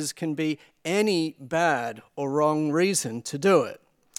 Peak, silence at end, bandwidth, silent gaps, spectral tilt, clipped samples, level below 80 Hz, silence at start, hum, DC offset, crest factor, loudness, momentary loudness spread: -8 dBFS; 0.4 s; 16.5 kHz; none; -4.5 dB/octave; under 0.1%; -72 dBFS; 0 s; none; under 0.1%; 18 dB; -25 LUFS; 11 LU